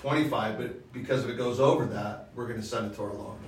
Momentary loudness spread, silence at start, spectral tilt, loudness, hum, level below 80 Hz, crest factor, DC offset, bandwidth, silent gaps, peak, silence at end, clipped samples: 12 LU; 0 s; -6 dB/octave; -30 LUFS; none; -58 dBFS; 22 dB; under 0.1%; 16 kHz; none; -8 dBFS; 0 s; under 0.1%